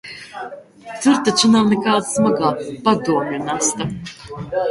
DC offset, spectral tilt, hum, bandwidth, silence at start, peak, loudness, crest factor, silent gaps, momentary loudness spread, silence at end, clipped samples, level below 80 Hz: under 0.1%; -4 dB/octave; none; 11.5 kHz; 0.05 s; -2 dBFS; -17 LUFS; 18 dB; none; 19 LU; 0 s; under 0.1%; -54 dBFS